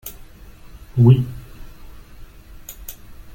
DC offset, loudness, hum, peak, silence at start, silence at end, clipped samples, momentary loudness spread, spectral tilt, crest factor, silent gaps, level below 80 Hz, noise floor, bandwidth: under 0.1%; -17 LUFS; none; -2 dBFS; 0.05 s; 0.45 s; under 0.1%; 26 LU; -8.5 dB/octave; 20 dB; none; -40 dBFS; -41 dBFS; 17 kHz